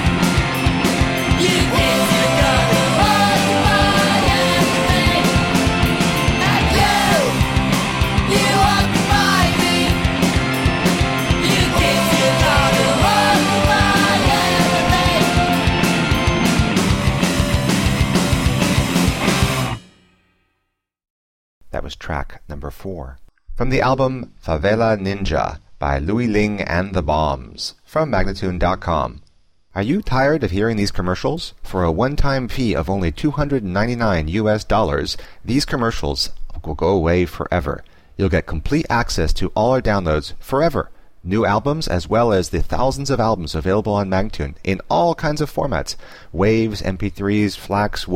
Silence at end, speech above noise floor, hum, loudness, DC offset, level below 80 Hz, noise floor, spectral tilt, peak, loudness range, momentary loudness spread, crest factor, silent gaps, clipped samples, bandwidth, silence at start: 0 s; 55 dB; none; -17 LUFS; under 0.1%; -28 dBFS; -73 dBFS; -5 dB/octave; -4 dBFS; 7 LU; 11 LU; 14 dB; 21.10-21.61 s; under 0.1%; 16.5 kHz; 0 s